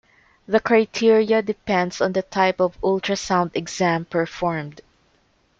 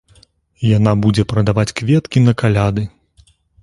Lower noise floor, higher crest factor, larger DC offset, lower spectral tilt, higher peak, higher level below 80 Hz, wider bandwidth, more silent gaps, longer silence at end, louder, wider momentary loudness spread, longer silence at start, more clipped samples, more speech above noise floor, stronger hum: first, -62 dBFS vs -52 dBFS; about the same, 16 dB vs 16 dB; neither; second, -5 dB/octave vs -7 dB/octave; second, -4 dBFS vs 0 dBFS; second, -54 dBFS vs -38 dBFS; second, 7.8 kHz vs 11.5 kHz; neither; about the same, 0.8 s vs 0.75 s; second, -21 LUFS vs -15 LUFS; about the same, 8 LU vs 7 LU; about the same, 0.5 s vs 0.6 s; neither; first, 42 dB vs 38 dB; neither